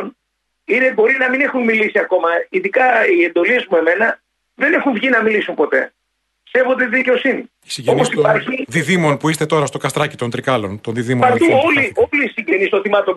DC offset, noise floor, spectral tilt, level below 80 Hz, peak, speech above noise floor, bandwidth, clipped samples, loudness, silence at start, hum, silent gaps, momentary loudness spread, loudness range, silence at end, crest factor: under 0.1%; -71 dBFS; -5 dB/octave; -58 dBFS; -2 dBFS; 56 dB; 12 kHz; under 0.1%; -15 LUFS; 0 s; none; none; 7 LU; 3 LU; 0 s; 14 dB